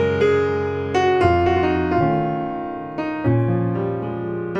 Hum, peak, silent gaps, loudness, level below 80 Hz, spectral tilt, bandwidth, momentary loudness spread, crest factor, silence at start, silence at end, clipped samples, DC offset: none; -2 dBFS; none; -20 LUFS; -46 dBFS; -8 dB/octave; 8 kHz; 9 LU; 16 dB; 0 s; 0 s; under 0.1%; under 0.1%